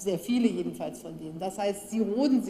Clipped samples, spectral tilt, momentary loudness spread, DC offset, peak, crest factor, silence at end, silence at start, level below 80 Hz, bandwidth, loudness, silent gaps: under 0.1%; -5.5 dB/octave; 11 LU; under 0.1%; -12 dBFS; 16 dB; 0 s; 0 s; -64 dBFS; 15.5 kHz; -29 LUFS; none